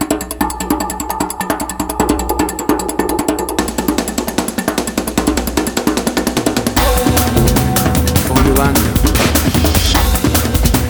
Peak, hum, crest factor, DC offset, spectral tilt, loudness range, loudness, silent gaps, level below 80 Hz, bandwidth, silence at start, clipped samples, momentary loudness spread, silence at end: 0 dBFS; none; 14 dB; under 0.1%; -4.5 dB/octave; 5 LU; -15 LUFS; none; -22 dBFS; over 20 kHz; 0 s; under 0.1%; 6 LU; 0 s